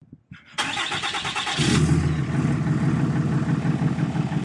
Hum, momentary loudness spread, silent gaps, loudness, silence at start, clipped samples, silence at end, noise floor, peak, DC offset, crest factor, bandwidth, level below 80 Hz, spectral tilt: none; 5 LU; none; -23 LUFS; 0.1 s; under 0.1%; 0 s; -46 dBFS; -8 dBFS; under 0.1%; 14 dB; 11.5 kHz; -44 dBFS; -5.5 dB/octave